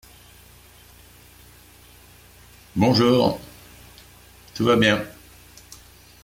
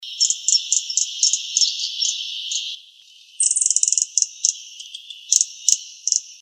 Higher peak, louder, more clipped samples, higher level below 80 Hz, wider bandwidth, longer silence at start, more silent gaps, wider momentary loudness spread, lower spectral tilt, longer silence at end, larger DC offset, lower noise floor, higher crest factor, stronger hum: second, -4 dBFS vs 0 dBFS; about the same, -20 LUFS vs -18 LUFS; neither; first, -52 dBFS vs -88 dBFS; about the same, 16.5 kHz vs 15.5 kHz; first, 2.75 s vs 0 s; neither; first, 27 LU vs 15 LU; first, -5.5 dB/octave vs 9 dB/octave; first, 1.15 s vs 0.05 s; neither; about the same, -49 dBFS vs -48 dBFS; about the same, 20 dB vs 22 dB; first, 60 Hz at -45 dBFS vs none